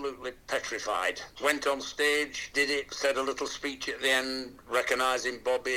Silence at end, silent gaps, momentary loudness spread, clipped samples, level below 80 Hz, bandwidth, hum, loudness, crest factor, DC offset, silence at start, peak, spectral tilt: 0 s; none; 7 LU; under 0.1%; -60 dBFS; 17 kHz; none; -29 LUFS; 20 dB; under 0.1%; 0 s; -10 dBFS; -1 dB/octave